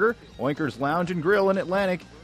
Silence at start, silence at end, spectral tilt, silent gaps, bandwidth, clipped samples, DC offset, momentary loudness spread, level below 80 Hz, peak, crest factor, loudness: 0 s; 0.05 s; -7 dB/octave; none; 15.5 kHz; under 0.1%; under 0.1%; 6 LU; -54 dBFS; -10 dBFS; 14 dB; -25 LUFS